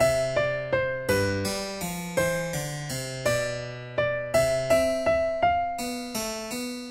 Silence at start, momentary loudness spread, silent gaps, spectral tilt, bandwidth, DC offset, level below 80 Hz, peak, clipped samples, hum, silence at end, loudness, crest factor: 0 s; 9 LU; none; -4 dB/octave; 16 kHz; under 0.1%; -48 dBFS; -10 dBFS; under 0.1%; none; 0 s; -27 LUFS; 16 dB